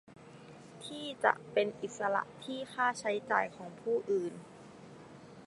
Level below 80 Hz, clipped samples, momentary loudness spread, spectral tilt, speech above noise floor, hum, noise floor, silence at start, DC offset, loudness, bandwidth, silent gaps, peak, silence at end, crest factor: -78 dBFS; under 0.1%; 21 LU; -4 dB/octave; 19 dB; none; -53 dBFS; 0.1 s; under 0.1%; -34 LUFS; 11.5 kHz; none; -10 dBFS; 0 s; 26 dB